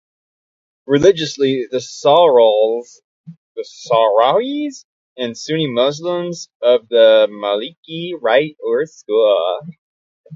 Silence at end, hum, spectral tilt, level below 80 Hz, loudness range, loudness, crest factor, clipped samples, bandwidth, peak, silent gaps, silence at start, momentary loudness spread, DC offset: 0 s; none; -4.5 dB/octave; -58 dBFS; 3 LU; -15 LUFS; 16 dB; under 0.1%; 7.8 kHz; 0 dBFS; 3.04-3.24 s, 3.37-3.55 s, 4.84-5.16 s, 6.55-6.60 s, 7.77-7.83 s, 9.78-10.24 s; 0.9 s; 16 LU; under 0.1%